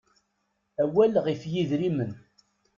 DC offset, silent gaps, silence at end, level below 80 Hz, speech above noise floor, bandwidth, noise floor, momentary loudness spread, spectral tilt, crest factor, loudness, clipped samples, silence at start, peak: under 0.1%; none; 0.6 s; -66 dBFS; 51 dB; 7.2 kHz; -76 dBFS; 15 LU; -8 dB/octave; 18 dB; -26 LUFS; under 0.1%; 0.8 s; -10 dBFS